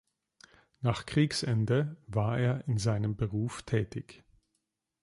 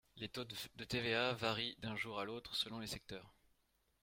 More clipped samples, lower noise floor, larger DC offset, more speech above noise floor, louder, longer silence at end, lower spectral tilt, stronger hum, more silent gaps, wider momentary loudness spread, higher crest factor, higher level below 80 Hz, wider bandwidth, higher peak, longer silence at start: neither; about the same, -82 dBFS vs -80 dBFS; neither; first, 52 dB vs 37 dB; first, -31 LUFS vs -42 LUFS; first, 0.85 s vs 0.7 s; first, -6.5 dB/octave vs -4 dB/octave; neither; neither; second, 6 LU vs 11 LU; second, 18 dB vs 24 dB; first, -56 dBFS vs -68 dBFS; second, 11.5 kHz vs 16.5 kHz; first, -14 dBFS vs -20 dBFS; first, 0.8 s vs 0.15 s